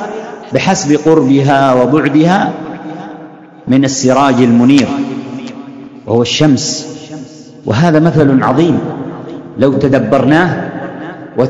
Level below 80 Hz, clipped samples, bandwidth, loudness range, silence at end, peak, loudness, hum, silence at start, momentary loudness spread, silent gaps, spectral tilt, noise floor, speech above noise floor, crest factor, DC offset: -46 dBFS; 1%; 8.6 kHz; 2 LU; 0 s; 0 dBFS; -10 LUFS; none; 0 s; 18 LU; none; -5.5 dB/octave; -33 dBFS; 24 dB; 12 dB; under 0.1%